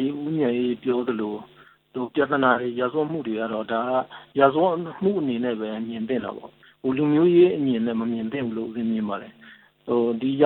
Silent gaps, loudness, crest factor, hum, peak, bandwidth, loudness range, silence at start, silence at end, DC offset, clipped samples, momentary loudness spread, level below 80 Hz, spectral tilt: none; -24 LUFS; 20 dB; none; -4 dBFS; 4.2 kHz; 2 LU; 0 s; 0 s; under 0.1%; under 0.1%; 12 LU; -66 dBFS; -10 dB/octave